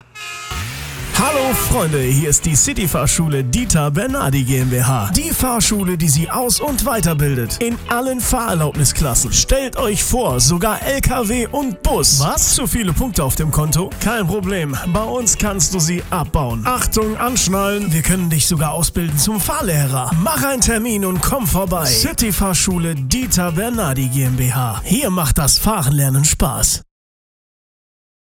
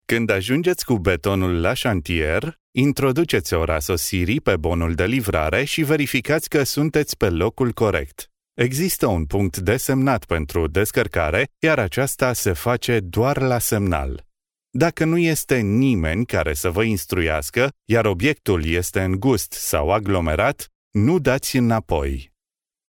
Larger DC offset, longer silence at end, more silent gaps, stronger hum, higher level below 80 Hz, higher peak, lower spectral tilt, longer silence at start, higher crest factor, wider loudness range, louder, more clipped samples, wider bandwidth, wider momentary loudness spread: neither; first, 1.4 s vs 0.65 s; second, none vs 2.60-2.73 s, 20.75-20.91 s; neither; first, -28 dBFS vs -38 dBFS; about the same, -2 dBFS vs -4 dBFS; about the same, -4 dB/octave vs -5 dB/octave; about the same, 0.15 s vs 0.1 s; about the same, 14 dB vs 18 dB; about the same, 2 LU vs 1 LU; first, -16 LUFS vs -20 LUFS; neither; about the same, over 20 kHz vs 19.5 kHz; about the same, 6 LU vs 4 LU